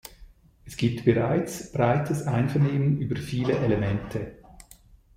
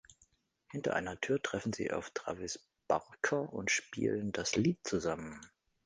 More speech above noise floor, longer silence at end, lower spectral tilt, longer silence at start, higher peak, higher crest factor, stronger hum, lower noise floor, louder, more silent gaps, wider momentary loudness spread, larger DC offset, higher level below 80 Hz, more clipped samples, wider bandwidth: second, 29 dB vs 36 dB; first, 0.55 s vs 0.4 s; first, -7 dB/octave vs -4 dB/octave; about the same, 0.05 s vs 0.1 s; first, -6 dBFS vs -16 dBFS; about the same, 20 dB vs 20 dB; neither; second, -54 dBFS vs -72 dBFS; first, -26 LUFS vs -36 LUFS; neither; about the same, 11 LU vs 10 LU; neither; first, -50 dBFS vs -64 dBFS; neither; first, 16 kHz vs 10 kHz